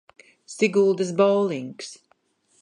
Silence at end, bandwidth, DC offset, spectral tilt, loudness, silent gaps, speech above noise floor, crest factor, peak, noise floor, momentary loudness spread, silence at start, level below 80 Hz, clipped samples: 0.65 s; 10.5 kHz; under 0.1%; -5.5 dB/octave; -22 LUFS; none; 44 dB; 18 dB; -6 dBFS; -65 dBFS; 19 LU; 0.5 s; -76 dBFS; under 0.1%